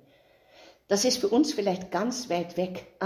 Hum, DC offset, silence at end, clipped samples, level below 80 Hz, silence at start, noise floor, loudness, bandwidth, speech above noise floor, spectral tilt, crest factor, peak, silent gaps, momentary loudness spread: none; under 0.1%; 0 s; under 0.1%; -66 dBFS; 0.9 s; -60 dBFS; -27 LUFS; 16 kHz; 33 dB; -4 dB/octave; 16 dB; -12 dBFS; none; 8 LU